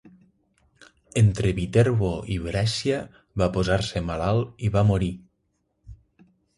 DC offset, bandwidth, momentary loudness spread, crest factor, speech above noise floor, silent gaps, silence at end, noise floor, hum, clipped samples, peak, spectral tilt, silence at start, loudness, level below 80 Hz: under 0.1%; 11.5 kHz; 9 LU; 18 dB; 50 dB; none; 0.65 s; -73 dBFS; none; under 0.1%; -6 dBFS; -6.5 dB/octave; 0.05 s; -24 LUFS; -40 dBFS